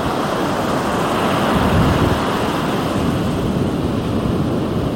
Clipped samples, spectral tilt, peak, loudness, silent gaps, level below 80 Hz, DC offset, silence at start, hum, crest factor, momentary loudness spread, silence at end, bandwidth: under 0.1%; -6 dB/octave; -4 dBFS; -18 LUFS; none; -32 dBFS; under 0.1%; 0 s; none; 14 dB; 4 LU; 0 s; 17 kHz